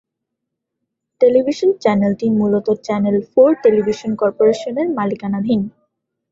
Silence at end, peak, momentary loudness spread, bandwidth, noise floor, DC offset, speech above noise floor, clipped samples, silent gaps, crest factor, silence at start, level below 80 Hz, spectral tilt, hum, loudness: 0.65 s; -2 dBFS; 7 LU; 7.8 kHz; -79 dBFS; under 0.1%; 63 dB; under 0.1%; none; 14 dB; 1.2 s; -58 dBFS; -7.5 dB/octave; none; -16 LUFS